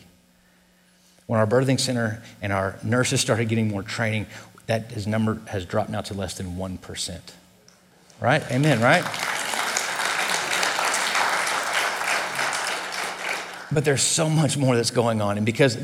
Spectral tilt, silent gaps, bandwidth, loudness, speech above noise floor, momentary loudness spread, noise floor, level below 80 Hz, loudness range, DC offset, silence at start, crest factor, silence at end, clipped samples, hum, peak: -4 dB/octave; none; 17 kHz; -23 LUFS; 36 dB; 10 LU; -58 dBFS; -58 dBFS; 7 LU; under 0.1%; 1.3 s; 22 dB; 0 s; under 0.1%; none; -2 dBFS